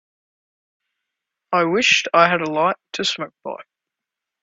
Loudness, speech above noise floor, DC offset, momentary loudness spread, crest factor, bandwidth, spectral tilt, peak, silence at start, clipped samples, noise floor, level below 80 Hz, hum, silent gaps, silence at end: -18 LUFS; 66 dB; under 0.1%; 18 LU; 22 dB; 8 kHz; -3 dB/octave; 0 dBFS; 1.5 s; under 0.1%; -85 dBFS; -68 dBFS; none; none; 0.8 s